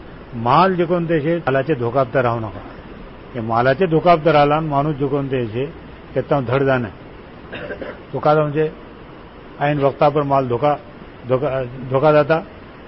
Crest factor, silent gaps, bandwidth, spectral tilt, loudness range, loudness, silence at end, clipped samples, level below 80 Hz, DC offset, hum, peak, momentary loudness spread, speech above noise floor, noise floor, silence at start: 16 dB; none; 5.8 kHz; -12 dB/octave; 4 LU; -18 LUFS; 0 s; under 0.1%; -44 dBFS; 0.1%; none; -2 dBFS; 23 LU; 21 dB; -38 dBFS; 0 s